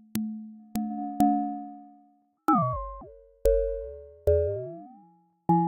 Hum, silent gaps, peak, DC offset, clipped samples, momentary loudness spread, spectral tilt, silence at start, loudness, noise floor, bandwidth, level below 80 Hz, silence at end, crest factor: none; none; -4 dBFS; under 0.1%; under 0.1%; 17 LU; -8.5 dB/octave; 0.15 s; -28 LUFS; -63 dBFS; 16 kHz; -42 dBFS; 0 s; 24 dB